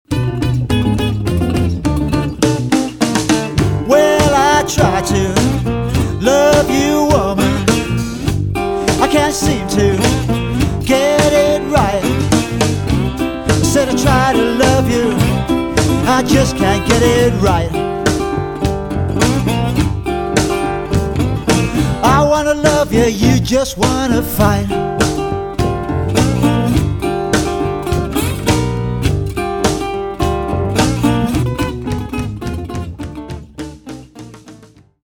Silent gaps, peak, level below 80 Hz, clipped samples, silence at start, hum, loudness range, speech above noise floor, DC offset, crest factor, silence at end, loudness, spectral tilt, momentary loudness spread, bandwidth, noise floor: none; 0 dBFS; -26 dBFS; under 0.1%; 0.1 s; none; 4 LU; 29 dB; under 0.1%; 14 dB; 0.4 s; -14 LUFS; -5.5 dB/octave; 7 LU; 18 kHz; -42 dBFS